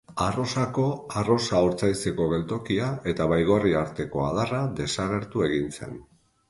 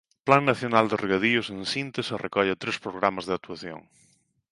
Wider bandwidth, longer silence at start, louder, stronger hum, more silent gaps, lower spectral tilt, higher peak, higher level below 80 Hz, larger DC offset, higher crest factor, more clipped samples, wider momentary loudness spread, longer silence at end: about the same, 11.5 kHz vs 11.5 kHz; second, 0.1 s vs 0.25 s; about the same, -26 LUFS vs -25 LUFS; neither; neither; about the same, -6 dB/octave vs -5 dB/octave; second, -8 dBFS vs -2 dBFS; first, -48 dBFS vs -62 dBFS; neither; second, 18 dB vs 24 dB; neither; second, 7 LU vs 13 LU; second, 0.5 s vs 0.7 s